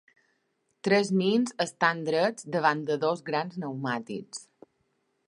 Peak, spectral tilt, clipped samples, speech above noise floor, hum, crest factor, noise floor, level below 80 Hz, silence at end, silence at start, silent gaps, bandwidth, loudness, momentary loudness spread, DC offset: -6 dBFS; -5 dB/octave; under 0.1%; 48 dB; none; 22 dB; -75 dBFS; -78 dBFS; 0.85 s; 0.85 s; none; 11.5 kHz; -28 LUFS; 11 LU; under 0.1%